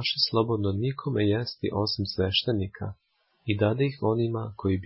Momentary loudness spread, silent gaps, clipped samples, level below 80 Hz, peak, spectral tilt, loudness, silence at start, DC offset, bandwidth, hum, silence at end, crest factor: 8 LU; none; under 0.1%; -48 dBFS; -10 dBFS; -9.5 dB/octave; -27 LUFS; 0 s; under 0.1%; 5.8 kHz; none; 0 s; 18 dB